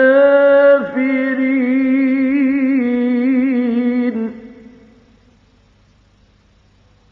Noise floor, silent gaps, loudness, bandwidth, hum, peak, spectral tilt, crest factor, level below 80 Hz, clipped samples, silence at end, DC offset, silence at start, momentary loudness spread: -52 dBFS; none; -14 LUFS; 4.5 kHz; none; -2 dBFS; -8 dB/octave; 14 dB; -58 dBFS; under 0.1%; 2.6 s; under 0.1%; 0 s; 8 LU